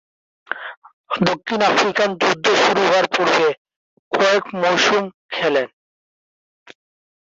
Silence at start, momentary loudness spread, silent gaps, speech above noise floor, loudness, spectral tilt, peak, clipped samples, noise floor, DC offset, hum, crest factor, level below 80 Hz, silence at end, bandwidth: 0.5 s; 14 LU; 0.77-0.82 s, 0.93-1.04 s, 3.58-3.65 s, 3.76-4.11 s, 5.14-5.29 s; over 73 dB; -17 LUFS; -3.5 dB/octave; -2 dBFS; under 0.1%; under -90 dBFS; under 0.1%; none; 18 dB; -62 dBFS; 1.55 s; 8 kHz